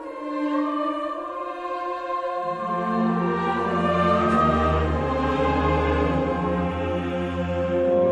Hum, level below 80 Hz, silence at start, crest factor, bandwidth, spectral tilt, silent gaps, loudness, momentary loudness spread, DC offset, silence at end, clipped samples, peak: none; -36 dBFS; 0 s; 14 dB; 9.8 kHz; -8 dB/octave; none; -24 LUFS; 9 LU; under 0.1%; 0 s; under 0.1%; -8 dBFS